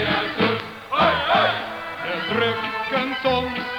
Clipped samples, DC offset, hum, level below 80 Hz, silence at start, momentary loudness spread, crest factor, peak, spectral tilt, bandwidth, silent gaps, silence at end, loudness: under 0.1%; under 0.1%; none; -50 dBFS; 0 s; 9 LU; 16 dB; -6 dBFS; -5.5 dB/octave; over 20 kHz; none; 0 s; -22 LUFS